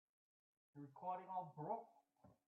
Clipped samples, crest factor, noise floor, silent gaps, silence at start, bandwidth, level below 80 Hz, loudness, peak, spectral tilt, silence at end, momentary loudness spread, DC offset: under 0.1%; 20 dB; -73 dBFS; none; 0.75 s; 4 kHz; under -90 dBFS; -50 LUFS; -34 dBFS; -7.5 dB/octave; 0.15 s; 16 LU; under 0.1%